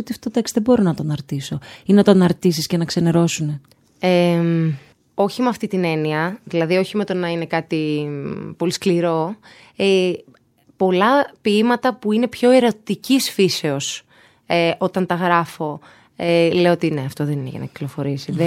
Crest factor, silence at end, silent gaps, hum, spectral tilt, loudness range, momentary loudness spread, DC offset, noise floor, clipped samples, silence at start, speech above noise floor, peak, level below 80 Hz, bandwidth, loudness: 18 dB; 0 s; none; none; -5.5 dB/octave; 4 LU; 12 LU; under 0.1%; -55 dBFS; under 0.1%; 0 s; 36 dB; 0 dBFS; -58 dBFS; 16 kHz; -19 LUFS